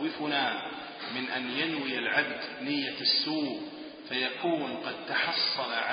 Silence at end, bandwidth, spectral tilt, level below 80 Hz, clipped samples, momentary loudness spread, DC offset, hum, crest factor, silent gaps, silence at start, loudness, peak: 0 s; 5.2 kHz; -7.5 dB/octave; -78 dBFS; under 0.1%; 10 LU; under 0.1%; none; 20 dB; none; 0 s; -30 LUFS; -12 dBFS